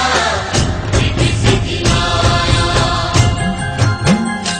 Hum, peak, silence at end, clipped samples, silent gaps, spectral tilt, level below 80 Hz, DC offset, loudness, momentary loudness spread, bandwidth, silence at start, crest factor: none; 0 dBFS; 0 s; under 0.1%; none; -4.5 dB/octave; -24 dBFS; under 0.1%; -14 LUFS; 3 LU; 10.5 kHz; 0 s; 14 dB